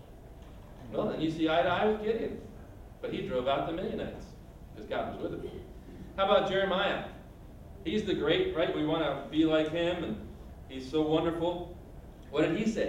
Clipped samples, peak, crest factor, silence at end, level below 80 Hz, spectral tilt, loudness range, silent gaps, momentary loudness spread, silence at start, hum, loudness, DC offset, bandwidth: under 0.1%; -12 dBFS; 20 dB; 0 s; -52 dBFS; -6 dB/octave; 6 LU; none; 23 LU; 0 s; none; -31 LUFS; under 0.1%; 15.5 kHz